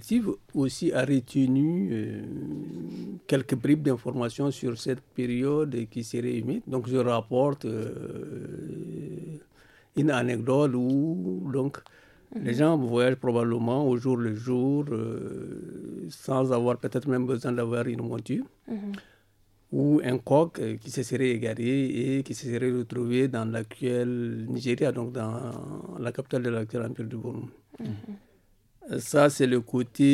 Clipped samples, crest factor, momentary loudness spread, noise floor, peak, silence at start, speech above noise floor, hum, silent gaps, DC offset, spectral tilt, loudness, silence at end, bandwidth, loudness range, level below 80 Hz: under 0.1%; 20 dB; 14 LU; -63 dBFS; -8 dBFS; 0 s; 36 dB; none; none; under 0.1%; -7 dB/octave; -28 LUFS; 0 s; 14.5 kHz; 4 LU; -64 dBFS